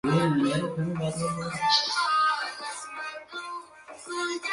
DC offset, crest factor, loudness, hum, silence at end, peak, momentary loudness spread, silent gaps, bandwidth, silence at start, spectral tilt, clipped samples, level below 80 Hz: under 0.1%; 18 dB; -27 LUFS; none; 0 s; -10 dBFS; 15 LU; none; 11.5 kHz; 0.05 s; -4.5 dB/octave; under 0.1%; -62 dBFS